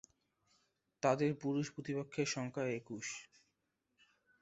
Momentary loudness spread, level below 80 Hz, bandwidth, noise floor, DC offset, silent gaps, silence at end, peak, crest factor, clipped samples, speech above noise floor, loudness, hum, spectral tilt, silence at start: 10 LU; -78 dBFS; 8 kHz; -85 dBFS; under 0.1%; none; 1.15 s; -18 dBFS; 24 dB; under 0.1%; 47 dB; -39 LUFS; none; -5.5 dB/octave; 1.05 s